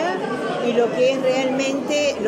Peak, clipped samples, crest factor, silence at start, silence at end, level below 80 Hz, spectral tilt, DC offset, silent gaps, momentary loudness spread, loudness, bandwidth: -8 dBFS; under 0.1%; 14 dB; 0 s; 0 s; -64 dBFS; -4 dB/octave; under 0.1%; none; 5 LU; -20 LUFS; 16 kHz